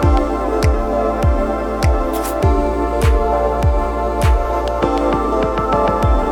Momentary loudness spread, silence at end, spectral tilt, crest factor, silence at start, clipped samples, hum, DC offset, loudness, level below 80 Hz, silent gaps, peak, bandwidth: 3 LU; 0 s; -7 dB/octave; 14 dB; 0 s; under 0.1%; none; 0.2%; -17 LUFS; -20 dBFS; none; -2 dBFS; 17.5 kHz